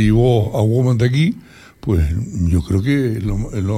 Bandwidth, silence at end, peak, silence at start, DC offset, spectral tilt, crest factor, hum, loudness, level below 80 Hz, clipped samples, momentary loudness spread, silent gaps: 14 kHz; 0 s; -4 dBFS; 0 s; under 0.1%; -8 dB/octave; 12 dB; none; -17 LUFS; -28 dBFS; under 0.1%; 7 LU; none